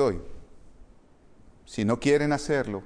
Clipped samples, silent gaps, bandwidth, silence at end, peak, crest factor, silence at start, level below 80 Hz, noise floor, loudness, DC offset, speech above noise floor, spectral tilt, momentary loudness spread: under 0.1%; none; 10.5 kHz; 0 s; -10 dBFS; 18 dB; 0 s; -48 dBFS; -54 dBFS; -26 LUFS; under 0.1%; 29 dB; -6 dB/octave; 16 LU